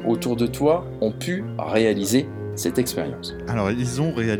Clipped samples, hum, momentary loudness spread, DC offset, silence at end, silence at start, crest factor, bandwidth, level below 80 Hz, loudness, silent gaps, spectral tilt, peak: under 0.1%; none; 8 LU; under 0.1%; 0 s; 0 s; 16 dB; 19.5 kHz; -46 dBFS; -23 LUFS; none; -5.5 dB/octave; -6 dBFS